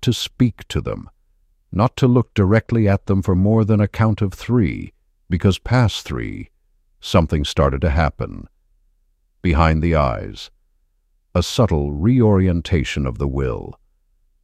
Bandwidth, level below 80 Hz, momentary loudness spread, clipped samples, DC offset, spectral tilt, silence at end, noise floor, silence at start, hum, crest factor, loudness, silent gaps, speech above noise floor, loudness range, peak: 14 kHz; -30 dBFS; 14 LU; under 0.1%; under 0.1%; -7 dB/octave; 0.7 s; -63 dBFS; 0 s; none; 16 dB; -19 LUFS; none; 46 dB; 4 LU; -2 dBFS